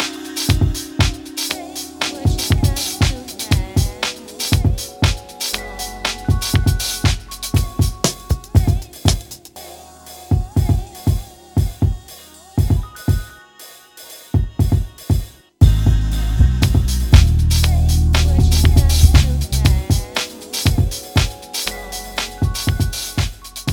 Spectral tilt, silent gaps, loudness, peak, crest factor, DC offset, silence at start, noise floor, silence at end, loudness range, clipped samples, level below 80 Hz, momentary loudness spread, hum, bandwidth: -4.5 dB/octave; none; -18 LUFS; 0 dBFS; 16 dB; under 0.1%; 0 s; -42 dBFS; 0 s; 7 LU; under 0.1%; -20 dBFS; 13 LU; none; 19 kHz